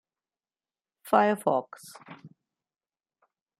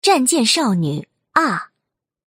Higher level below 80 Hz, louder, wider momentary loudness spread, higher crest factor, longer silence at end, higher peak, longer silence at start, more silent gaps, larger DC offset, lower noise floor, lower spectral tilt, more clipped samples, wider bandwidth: second, -82 dBFS vs -66 dBFS; second, -26 LUFS vs -17 LUFS; first, 23 LU vs 11 LU; first, 24 dB vs 18 dB; first, 1.3 s vs 0.65 s; second, -6 dBFS vs 0 dBFS; first, 1.05 s vs 0.05 s; neither; neither; first, under -90 dBFS vs -79 dBFS; first, -5.5 dB/octave vs -3.5 dB/octave; neither; about the same, 15.5 kHz vs 16 kHz